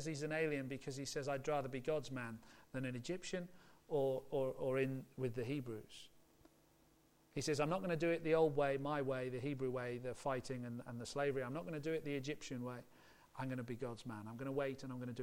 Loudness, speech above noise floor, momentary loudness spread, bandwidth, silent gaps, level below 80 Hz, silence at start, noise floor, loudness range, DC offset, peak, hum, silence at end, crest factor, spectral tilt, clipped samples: -42 LUFS; 30 dB; 11 LU; 16.5 kHz; none; -68 dBFS; 0 s; -72 dBFS; 5 LU; under 0.1%; -22 dBFS; none; 0 s; 20 dB; -6 dB/octave; under 0.1%